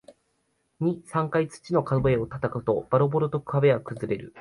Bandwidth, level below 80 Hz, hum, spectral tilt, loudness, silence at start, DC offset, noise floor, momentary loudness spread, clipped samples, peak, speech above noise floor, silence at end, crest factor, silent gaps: 11.5 kHz; -52 dBFS; none; -8 dB/octave; -26 LUFS; 0.1 s; under 0.1%; -72 dBFS; 7 LU; under 0.1%; -8 dBFS; 47 dB; 0 s; 18 dB; none